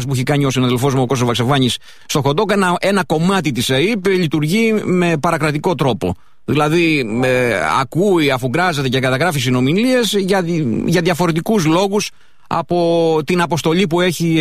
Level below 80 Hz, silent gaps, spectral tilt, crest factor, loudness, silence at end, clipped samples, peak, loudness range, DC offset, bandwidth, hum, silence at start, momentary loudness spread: -46 dBFS; none; -5.5 dB/octave; 12 dB; -15 LUFS; 0 s; under 0.1%; -2 dBFS; 1 LU; 1%; 15.5 kHz; none; 0 s; 4 LU